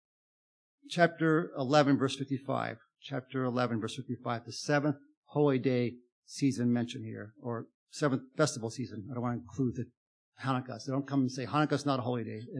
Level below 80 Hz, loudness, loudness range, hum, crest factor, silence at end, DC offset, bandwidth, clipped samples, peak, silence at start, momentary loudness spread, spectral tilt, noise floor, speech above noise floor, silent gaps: -76 dBFS; -32 LUFS; 4 LU; none; 24 dB; 0 s; under 0.1%; 10.5 kHz; under 0.1%; -10 dBFS; 0.85 s; 13 LU; -6 dB/octave; under -90 dBFS; over 58 dB; 5.17-5.22 s, 6.12-6.22 s, 7.74-7.87 s, 9.97-10.32 s